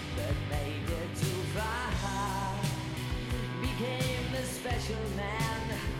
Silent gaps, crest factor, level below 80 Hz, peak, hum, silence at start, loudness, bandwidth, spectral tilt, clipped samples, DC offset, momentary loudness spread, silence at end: none; 14 dB; -42 dBFS; -20 dBFS; none; 0 s; -34 LUFS; 16.5 kHz; -5 dB/octave; under 0.1%; under 0.1%; 3 LU; 0 s